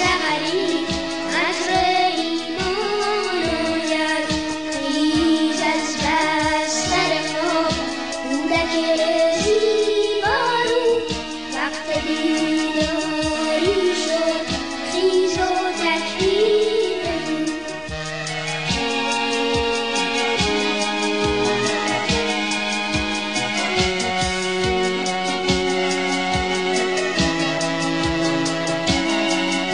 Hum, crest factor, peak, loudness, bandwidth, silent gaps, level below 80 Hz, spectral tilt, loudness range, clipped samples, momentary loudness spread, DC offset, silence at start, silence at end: none; 14 dB; -6 dBFS; -20 LUFS; 11 kHz; none; -42 dBFS; -3.5 dB/octave; 2 LU; under 0.1%; 5 LU; 0.6%; 0 s; 0 s